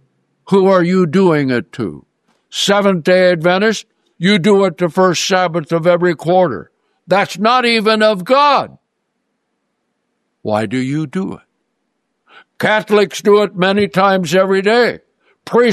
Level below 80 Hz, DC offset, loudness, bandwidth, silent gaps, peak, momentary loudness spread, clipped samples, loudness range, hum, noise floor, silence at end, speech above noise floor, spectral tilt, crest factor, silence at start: -60 dBFS; under 0.1%; -13 LUFS; 13.5 kHz; none; -2 dBFS; 9 LU; under 0.1%; 8 LU; none; -70 dBFS; 0 s; 57 dB; -5 dB/octave; 14 dB; 0.45 s